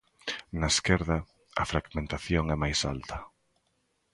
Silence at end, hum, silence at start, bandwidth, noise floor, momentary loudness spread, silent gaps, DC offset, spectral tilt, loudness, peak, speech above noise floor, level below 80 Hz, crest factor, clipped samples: 0.85 s; none; 0.25 s; 11.5 kHz; -75 dBFS; 11 LU; none; under 0.1%; -4 dB/octave; -30 LUFS; -8 dBFS; 45 dB; -42 dBFS; 24 dB; under 0.1%